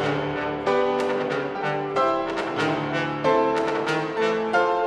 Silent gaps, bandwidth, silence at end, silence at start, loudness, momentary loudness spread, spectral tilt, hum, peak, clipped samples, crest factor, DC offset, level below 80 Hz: none; 11.5 kHz; 0 s; 0 s; -24 LUFS; 5 LU; -5.5 dB/octave; none; -8 dBFS; under 0.1%; 16 dB; under 0.1%; -56 dBFS